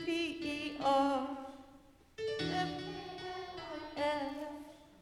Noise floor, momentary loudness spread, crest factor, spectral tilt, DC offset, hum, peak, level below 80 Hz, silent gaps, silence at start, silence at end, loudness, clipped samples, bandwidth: -61 dBFS; 17 LU; 20 dB; -5 dB/octave; under 0.1%; none; -18 dBFS; -66 dBFS; none; 0 s; 0 s; -37 LUFS; under 0.1%; 14 kHz